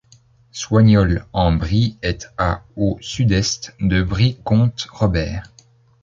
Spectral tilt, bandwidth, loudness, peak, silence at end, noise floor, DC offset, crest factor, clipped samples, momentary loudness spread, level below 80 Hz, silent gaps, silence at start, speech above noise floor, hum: -6 dB/octave; 7.6 kHz; -18 LUFS; -2 dBFS; 0.6 s; -52 dBFS; under 0.1%; 16 dB; under 0.1%; 10 LU; -32 dBFS; none; 0.55 s; 35 dB; none